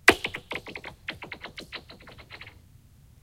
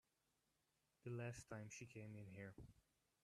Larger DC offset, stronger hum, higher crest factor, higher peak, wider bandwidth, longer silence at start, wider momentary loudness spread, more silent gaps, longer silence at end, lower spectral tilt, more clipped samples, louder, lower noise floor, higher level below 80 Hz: neither; neither; first, 32 dB vs 18 dB; first, 0 dBFS vs -38 dBFS; first, 16.5 kHz vs 13 kHz; second, 0.05 s vs 1.05 s; first, 16 LU vs 9 LU; neither; first, 0.75 s vs 0.45 s; second, -2.5 dB/octave vs -5.5 dB/octave; neither; first, -32 LUFS vs -56 LUFS; second, -54 dBFS vs -87 dBFS; first, -54 dBFS vs -78 dBFS